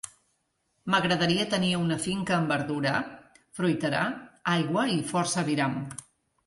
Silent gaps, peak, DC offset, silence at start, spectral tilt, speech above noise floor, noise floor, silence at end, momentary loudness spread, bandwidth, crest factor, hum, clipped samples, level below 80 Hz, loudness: none; -10 dBFS; under 0.1%; 0.05 s; -4.5 dB/octave; 48 dB; -75 dBFS; 0.45 s; 13 LU; 11.5 kHz; 20 dB; none; under 0.1%; -62 dBFS; -27 LUFS